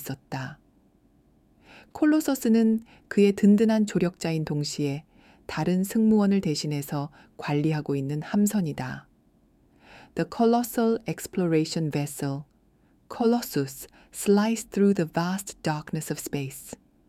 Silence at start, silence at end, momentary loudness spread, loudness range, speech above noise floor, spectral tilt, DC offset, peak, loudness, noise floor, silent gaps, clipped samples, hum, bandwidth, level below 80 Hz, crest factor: 0 s; 0.35 s; 15 LU; 5 LU; 37 dB; -6 dB/octave; under 0.1%; -10 dBFS; -26 LUFS; -62 dBFS; none; under 0.1%; none; 16 kHz; -60 dBFS; 16 dB